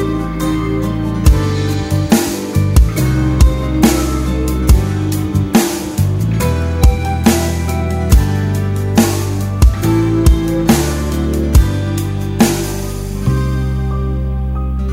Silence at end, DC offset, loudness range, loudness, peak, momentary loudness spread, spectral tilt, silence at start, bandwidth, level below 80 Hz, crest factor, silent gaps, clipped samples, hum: 0 s; under 0.1%; 2 LU; -15 LUFS; 0 dBFS; 6 LU; -6 dB/octave; 0 s; 16.5 kHz; -18 dBFS; 14 dB; none; under 0.1%; none